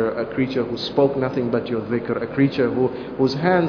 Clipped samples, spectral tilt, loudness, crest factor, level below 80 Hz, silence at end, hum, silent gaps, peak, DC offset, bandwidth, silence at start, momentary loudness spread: under 0.1%; -8 dB/octave; -22 LUFS; 18 dB; -52 dBFS; 0 s; none; none; -4 dBFS; under 0.1%; 5.4 kHz; 0 s; 5 LU